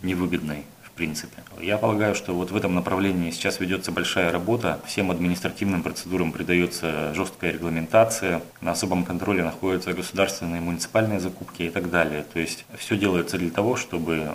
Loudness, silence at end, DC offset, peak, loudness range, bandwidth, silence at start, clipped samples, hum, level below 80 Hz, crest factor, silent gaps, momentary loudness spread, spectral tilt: -25 LUFS; 0 s; under 0.1%; -4 dBFS; 2 LU; 16 kHz; 0 s; under 0.1%; none; -52 dBFS; 20 dB; none; 7 LU; -5 dB/octave